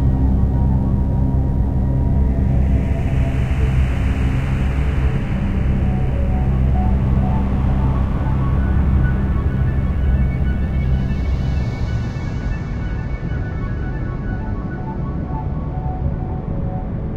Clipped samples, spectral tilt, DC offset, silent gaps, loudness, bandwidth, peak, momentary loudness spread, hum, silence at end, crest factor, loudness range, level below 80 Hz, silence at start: under 0.1%; -9 dB/octave; under 0.1%; none; -20 LUFS; 5.4 kHz; -4 dBFS; 7 LU; none; 0 s; 14 dB; 6 LU; -20 dBFS; 0 s